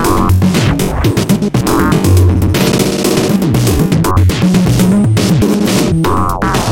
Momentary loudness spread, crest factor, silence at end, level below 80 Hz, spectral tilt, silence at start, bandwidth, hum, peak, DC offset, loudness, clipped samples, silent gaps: 3 LU; 10 dB; 0 s; -24 dBFS; -6 dB/octave; 0 s; 17 kHz; none; 0 dBFS; under 0.1%; -11 LUFS; under 0.1%; none